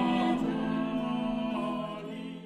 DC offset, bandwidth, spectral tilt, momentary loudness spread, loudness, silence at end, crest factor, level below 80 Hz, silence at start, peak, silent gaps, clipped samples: under 0.1%; 10.5 kHz; -7 dB/octave; 10 LU; -32 LUFS; 0 s; 14 dB; -56 dBFS; 0 s; -18 dBFS; none; under 0.1%